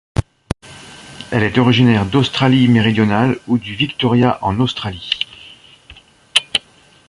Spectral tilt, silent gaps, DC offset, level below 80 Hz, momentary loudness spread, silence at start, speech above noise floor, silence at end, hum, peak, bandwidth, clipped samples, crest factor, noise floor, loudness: -6 dB/octave; none; under 0.1%; -40 dBFS; 16 LU; 0.15 s; 34 dB; 0.5 s; none; 0 dBFS; 11.5 kHz; under 0.1%; 16 dB; -48 dBFS; -15 LUFS